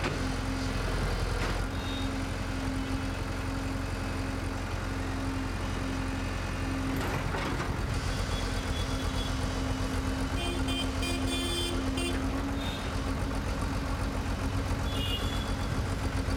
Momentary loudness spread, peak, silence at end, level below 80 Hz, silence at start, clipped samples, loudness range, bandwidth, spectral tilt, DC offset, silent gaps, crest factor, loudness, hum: 3 LU; -16 dBFS; 0 s; -36 dBFS; 0 s; under 0.1%; 3 LU; 17.5 kHz; -5 dB/octave; under 0.1%; none; 14 dB; -32 LUFS; none